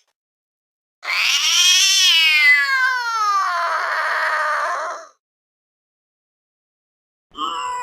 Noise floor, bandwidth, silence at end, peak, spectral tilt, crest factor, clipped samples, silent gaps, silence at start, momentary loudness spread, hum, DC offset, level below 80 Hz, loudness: under -90 dBFS; 19.5 kHz; 0 s; 0 dBFS; 4.5 dB/octave; 20 dB; under 0.1%; 5.19-7.30 s; 1.05 s; 15 LU; none; under 0.1%; -70 dBFS; -15 LUFS